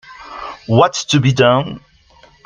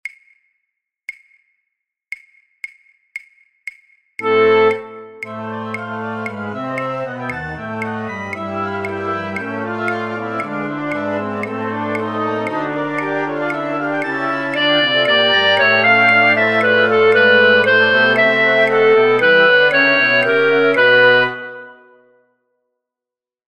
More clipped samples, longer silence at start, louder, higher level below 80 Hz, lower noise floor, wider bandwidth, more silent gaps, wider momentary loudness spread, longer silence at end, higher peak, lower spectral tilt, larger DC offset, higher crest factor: neither; about the same, 0.1 s vs 0.05 s; about the same, -14 LUFS vs -15 LUFS; first, -50 dBFS vs -60 dBFS; second, -48 dBFS vs -88 dBFS; about the same, 9.6 kHz vs 9.2 kHz; neither; second, 19 LU vs 22 LU; second, 0.7 s vs 1.75 s; about the same, 0 dBFS vs -2 dBFS; about the same, -5.5 dB/octave vs -5 dB/octave; neither; about the same, 16 dB vs 16 dB